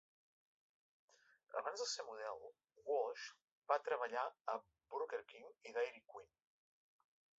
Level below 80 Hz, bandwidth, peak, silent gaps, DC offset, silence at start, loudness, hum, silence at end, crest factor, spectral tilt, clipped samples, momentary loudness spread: under -90 dBFS; 7.6 kHz; -22 dBFS; 3.44-3.62 s, 4.41-4.45 s; under 0.1%; 1.5 s; -45 LUFS; none; 1.15 s; 24 dB; 2 dB/octave; under 0.1%; 17 LU